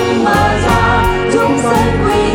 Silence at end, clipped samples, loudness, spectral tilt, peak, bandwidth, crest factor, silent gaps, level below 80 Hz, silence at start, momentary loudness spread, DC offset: 0 s; under 0.1%; -12 LUFS; -5.5 dB/octave; 0 dBFS; 18 kHz; 12 dB; none; -24 dBFS; 0 s; 2 LU; under 0.1%